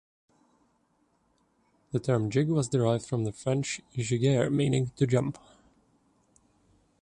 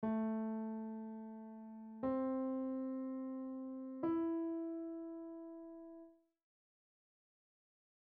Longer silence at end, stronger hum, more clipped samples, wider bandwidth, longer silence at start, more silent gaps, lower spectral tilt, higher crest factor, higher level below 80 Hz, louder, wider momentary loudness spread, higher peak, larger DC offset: second, 1.65 s vs 1.95 s; neither; neither; first, 11 kHz vs 3.6 kHz; first, 1.95 s vs 0 s; neither; second, -6.5 dB/octave vs -8.5 dB/octave; about the same, 18 dB vs 14 dB; first, -60 dBFS vs -78 dBFS; first, -28 LUFS vs -43 LUFS; second, 8 LU vs 14 LU; first, -12 dBFS vs -30 dBFS; neither